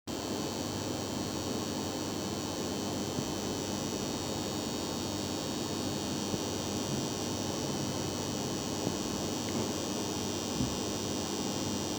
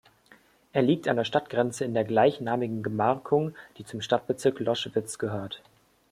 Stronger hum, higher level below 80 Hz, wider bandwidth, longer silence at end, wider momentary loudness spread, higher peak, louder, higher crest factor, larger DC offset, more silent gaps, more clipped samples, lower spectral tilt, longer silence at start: neither; first, -58 dBFS vs -68 dBFS; first, over 20 kHz vs 15 kHz; second, 0 s vs 0.55 s; second, 2 LU vs 12 LU; second, -18 dBFS vs -8 dBFS; second, -34 LUFS vs -27 LUFS; about the same, 18 dB vs 20 dB; neither; neither; neither; second, -4 dB/octave vs -5.5 dB/octave; second, 0.05 s vs 0.75 s